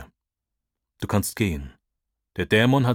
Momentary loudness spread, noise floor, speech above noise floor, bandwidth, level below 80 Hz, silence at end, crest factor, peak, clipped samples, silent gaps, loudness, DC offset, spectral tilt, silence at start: 18 LU; -84 dBFS; 63 dB; 18 kHz; -44 dBFS; 0 s; 18 dB; -6 dBFS; under 0.1%; none; -23 LUFS; under 0.1%; -5.5 dB/octave; 0 s